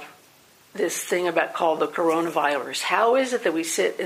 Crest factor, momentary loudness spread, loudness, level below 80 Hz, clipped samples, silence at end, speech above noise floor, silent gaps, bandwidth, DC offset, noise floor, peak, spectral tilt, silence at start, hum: 18 dB; 6 LU; -23 LUFS; -78 dBFS; under 0.1%; 0 s; 32 dB; none; 15.5 kHz; under 0.1%; -55 dBFS; -6 dBFS; -2.5 dB/octave; 0 s; none